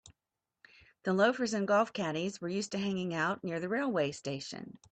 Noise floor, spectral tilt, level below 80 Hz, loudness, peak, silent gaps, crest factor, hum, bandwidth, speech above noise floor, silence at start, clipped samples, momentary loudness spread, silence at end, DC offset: -89 dBFS; -5 dB/octave; -74 dBFS; -33 LUFS; -16 dBFS; none; 18 dB; none; 9 kHz; 57 dB; 0.05 s; under 0.1%; 11 LU; 0.2 s; under 0.1%